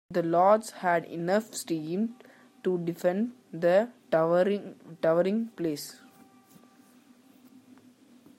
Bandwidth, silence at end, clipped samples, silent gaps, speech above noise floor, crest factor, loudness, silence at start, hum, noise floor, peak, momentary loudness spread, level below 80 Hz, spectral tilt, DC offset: 16 kHz; 2.45 s; under 0.1%; none; 31 dB; 20 dB; -28 LUFS; 0.1 s; none; -58 dBFS; -10 dBFS; 11 LU; -80 dBFS; -6 dB/octave; under 0.1%